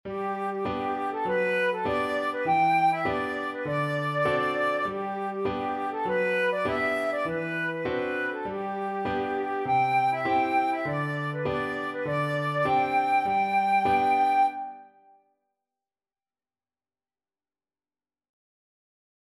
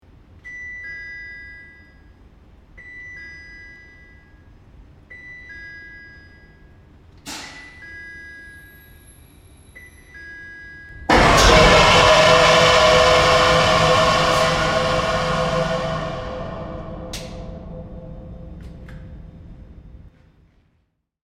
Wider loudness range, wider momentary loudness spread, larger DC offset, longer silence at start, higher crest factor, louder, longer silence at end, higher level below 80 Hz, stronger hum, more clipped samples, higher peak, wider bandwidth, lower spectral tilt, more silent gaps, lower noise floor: second, 3 LU vs 26 LU; second, 7 LU vs 27 LU; neither; second, 0.05 s vs 0.45 s; second, 14 dB vs 20 dB; second, -27 LUFS vs -14 LUFS; first, 4.5 s vs 1.35 s; second, -60 dBFS vs -34 dBFS; neither; neither; second, -12 dBFS vs 0 dBFS; second, 13 kHz vs 16 kHz; first, -6.5 dB/octave vs -3.5 dB/octave; neither; first, under -90 dBFS vs -67 dBFS